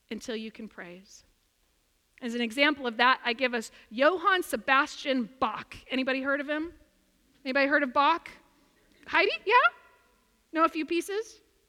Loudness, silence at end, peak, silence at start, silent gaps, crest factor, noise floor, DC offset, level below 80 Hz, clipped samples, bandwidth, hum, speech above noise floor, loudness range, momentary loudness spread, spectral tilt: -27 LUFS; 0.35 s; -8 dBFS; 0.1 s; none; 22 dB; -70 dBFS; under 0.1%; -66 dBFS; under 0.1%; 16.5 kHz; none; 43 dB; 3 LU; 17 LU; -3 dB/octave